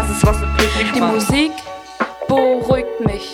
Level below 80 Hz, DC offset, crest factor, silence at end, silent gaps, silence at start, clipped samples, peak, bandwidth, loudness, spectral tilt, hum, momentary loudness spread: -26 dBFS; under 0.1%; 16 dB; 0 s; none; 0 s; under 0.1%; 0 dBFS; 17.5 kHz; -17 LUFS; -5 dB/octave; none; 9 LU